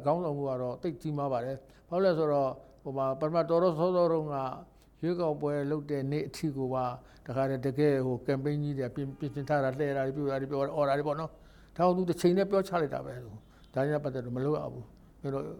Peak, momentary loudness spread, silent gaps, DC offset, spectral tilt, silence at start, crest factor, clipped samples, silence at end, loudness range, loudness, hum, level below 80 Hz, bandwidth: -14 dBFS; 11 LU; none; under 0.1%; -8 dB/octave; 0 s; 18 dB; under 0.1%; 0 s; 3 LU; -31 LUFS; none; -60 dBFS; 19 kHz